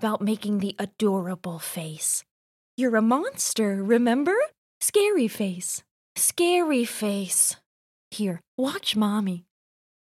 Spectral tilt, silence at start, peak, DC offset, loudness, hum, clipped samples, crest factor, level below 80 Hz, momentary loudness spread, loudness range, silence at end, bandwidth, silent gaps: -3.5 dB/octave; 0 s; -8 dBFS; under 0.1%; -25 LUFS; none; under 0.1%; 18 dB; -76 dBFS; 11 LU; 3 LU; 0.65 s; 16 kHz; 2.31-2.78 s, 4.58-4.81 s, 5.91-6.15 s, 7.66-8.11 s, 8.48-8.58 s